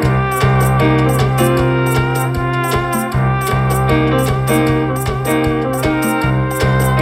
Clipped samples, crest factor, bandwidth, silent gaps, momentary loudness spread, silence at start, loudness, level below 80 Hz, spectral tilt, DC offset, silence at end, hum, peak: under 0.1%; 12 dB; 16 kHz; none; 4 LU; 0 s; -15 LUFS; -28 dBFS; -6 dB/octave; under 0.1%; 0 s; none; -2 dBFS